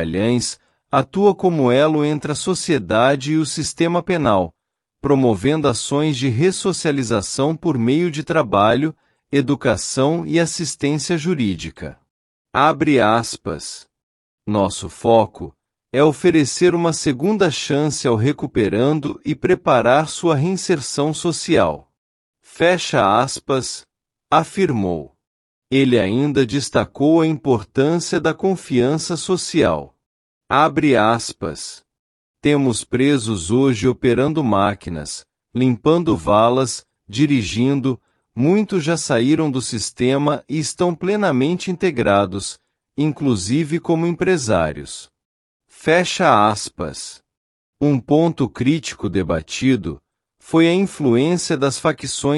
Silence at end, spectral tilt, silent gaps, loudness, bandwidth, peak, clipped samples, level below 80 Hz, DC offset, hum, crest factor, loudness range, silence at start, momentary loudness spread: 0 s; -5.5 dB/octave; 12.10-12.45 s, 14.03-14.38 s, 21.98-22.33 s, 25.27-25.62 s, 30.06-30.41 s, 31.99-32.34 s, 45.25-45.60 s, 47.37-47.73 s; -18 LUFS; 12 kHz; -2 dBFS; under 0.1%; -50 dBFS; under 0.1%; none; 16 dB; 2 LU; 0 s; 11 LU